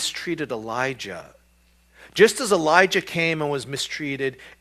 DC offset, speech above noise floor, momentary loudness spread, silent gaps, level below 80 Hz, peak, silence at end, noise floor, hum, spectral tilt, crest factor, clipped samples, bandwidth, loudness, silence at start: under 0.1%; 36 dB; 13 LU; none; -60 dBFS; 0 dBFS; 0.1 s; -59 dBFS; none; -3.5 dB/octave; 24 dB; under 0.1%; 14.5 kHz; -22 LUFS; 0 s